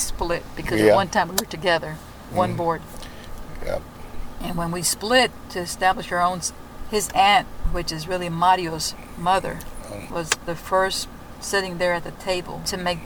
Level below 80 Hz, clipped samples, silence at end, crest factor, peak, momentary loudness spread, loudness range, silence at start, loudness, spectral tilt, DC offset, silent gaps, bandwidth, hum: -38 dBFS; under 0.1%; 0 s; 20 dB; -4 dBFS; 17 LU; 4 LU; 0 s; -23 LUFS; -3 dB/octave; under 0.1%; none; over 20 kHz; none